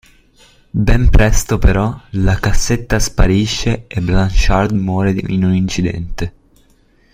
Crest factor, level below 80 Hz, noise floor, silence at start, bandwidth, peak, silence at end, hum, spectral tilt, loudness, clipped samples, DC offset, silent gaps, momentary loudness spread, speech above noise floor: 12 dB; -18 dBFS; -52 dBFS; 0.75 s; 16 kHz; 0 dBFS; 0.85 s; none; -5.5 dB/octave; -16 LUFS; under 0.1%; under 0.1%; none; 7 LU; 39 dB